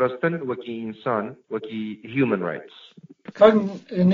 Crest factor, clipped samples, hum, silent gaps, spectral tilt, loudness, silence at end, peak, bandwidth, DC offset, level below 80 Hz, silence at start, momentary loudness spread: 20 dB; under 0.1%; none; none; -6 dB/octave; -23 LUFS; 0 s; -2 dBFS; 7.2 kHz; under 0.1%; -66 dBFS; 0 s; 16 LU